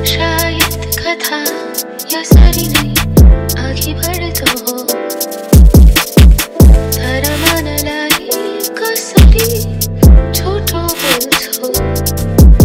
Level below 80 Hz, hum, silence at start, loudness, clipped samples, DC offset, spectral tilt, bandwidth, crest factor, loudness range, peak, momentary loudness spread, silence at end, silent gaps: -12 dBFS; none; 0 s; -11 LUFS; 7%; under 0.1%; -4.5 dB/octave; 17 kHz; 10 dB; 3 LU; 0 dBFS; 9 LU; 0 s; none